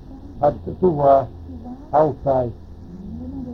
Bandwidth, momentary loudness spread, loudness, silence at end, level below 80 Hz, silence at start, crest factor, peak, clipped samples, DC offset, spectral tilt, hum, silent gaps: 6 kHz; 21 LU; -19 LUFS; 0 s; -40 dBFS; 0 s; 18 dB; -2 dBFS; under 0.1%; under 0.1%; -10.5 dB/octave; none; none